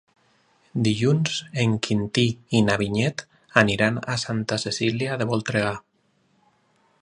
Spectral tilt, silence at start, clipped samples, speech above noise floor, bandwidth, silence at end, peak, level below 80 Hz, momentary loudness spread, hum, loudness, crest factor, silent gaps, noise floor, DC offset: -5 dB/octave; 0.75 s; under 0.1%; 43 dB; 11 kHz; 1.25 s; 0 dBFS; -54 dBFS; 6 LU; none; -23 LUFS; 24 dB; none; -66 dBFS; under 0.1%